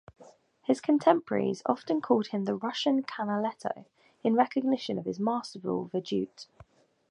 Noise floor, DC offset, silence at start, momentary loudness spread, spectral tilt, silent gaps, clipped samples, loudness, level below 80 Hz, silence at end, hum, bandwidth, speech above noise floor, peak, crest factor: -57 dBFS; under 0.1%; 0.2 s; 12 LU; -6 dB/octave; none; under 0.1%; -29 LUFS; -72 dBFS; 0.65 s; none; 10.5 kHz; 28 dB; -8 dBFS; 22 dB